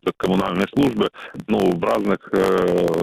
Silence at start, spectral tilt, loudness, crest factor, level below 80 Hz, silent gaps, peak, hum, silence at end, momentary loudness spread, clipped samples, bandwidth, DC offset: 0.05 s; -6.5 dB/octave; -20 LUFS; 12 dB; -48 dBFS; none; -8 dBFS; none; 0 s; 6 LU; under 0.1%; 16 kHz; under 0.1%